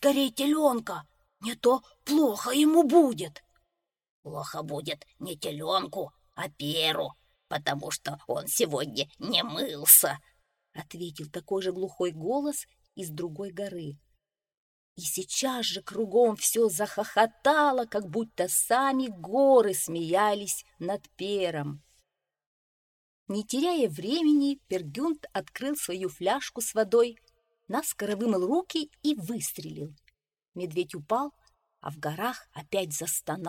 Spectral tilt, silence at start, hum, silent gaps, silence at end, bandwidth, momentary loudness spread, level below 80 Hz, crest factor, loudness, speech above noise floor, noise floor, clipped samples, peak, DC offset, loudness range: -3 dB/octave; 0 s; none; 4.09-4.23 s, 14.57-14.96 s, 22.47-23.26 s; 0 s; 17 kHz; 15 LU; -70 dBFS; 26 dB; -27 LUFS; 53 dB; -80 dBFS; under 0.1%; -2 dBFS; under 0.1%; 10 LU